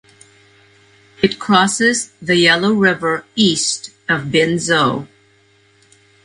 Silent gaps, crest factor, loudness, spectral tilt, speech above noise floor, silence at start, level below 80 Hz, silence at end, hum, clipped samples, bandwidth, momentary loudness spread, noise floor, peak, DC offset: none; 18 dB; -15 LUFS; -3.5 dB/octave; 38 dB; 1.2 s; -54 dBFS; 1.2 s; none; under 0.1%; 11.5 kHz; 8 LU; -54 dBFS; 0 dBFS; under 0.1%